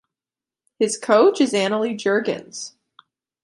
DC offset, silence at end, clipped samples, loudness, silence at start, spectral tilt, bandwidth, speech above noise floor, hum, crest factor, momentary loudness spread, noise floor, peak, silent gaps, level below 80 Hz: under 0.1%; 0.75 s; under 0.1%; -19 LUFS; 0.8 s; -4 dB/octave; 11.5 kHz; over 71 dB; none; 20 dB; 17 LU; under -90 dBFS; -2 dBFS; none; -74 dBFS